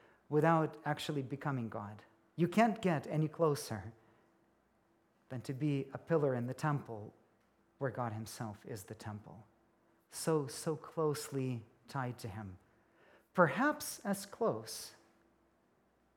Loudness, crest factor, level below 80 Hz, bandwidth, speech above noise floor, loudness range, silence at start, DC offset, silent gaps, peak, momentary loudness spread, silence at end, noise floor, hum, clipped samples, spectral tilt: -37 LUFS; 24 dB; -78 dBFS; 18 kHz; 37 dB; 6 LU; 0.3 s; under 0.1%; none; -14 dBFS; 17 LU; 1.25 s; -74 dBFS; none; under 0.1%; -6 dB/octave